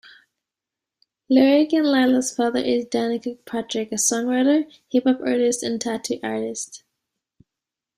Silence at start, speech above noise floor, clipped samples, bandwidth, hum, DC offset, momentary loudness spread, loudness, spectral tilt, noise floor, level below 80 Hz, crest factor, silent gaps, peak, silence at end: 1.3 s; 66 dB; under 0.1%; 15.5 kHz; none; under 0.1%; 10 LU; -21 LUFS; -3 dB/octave; -87 dBFS; -68 dBFS; 18 dB; none; -4 dBFS; 1.2 s